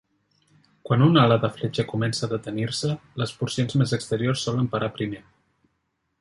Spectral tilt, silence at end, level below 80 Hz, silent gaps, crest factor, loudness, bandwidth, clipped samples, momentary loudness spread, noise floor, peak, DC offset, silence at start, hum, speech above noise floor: -6 dB/octave; 1 s; -58 dBFS; none; 20 dB; -24 LUFS; 11.5 kHz; under 0.1%; 11 LU; -75 dBFS; -4 dBFS; under 0.1%; 0.85 s; none; 51 dB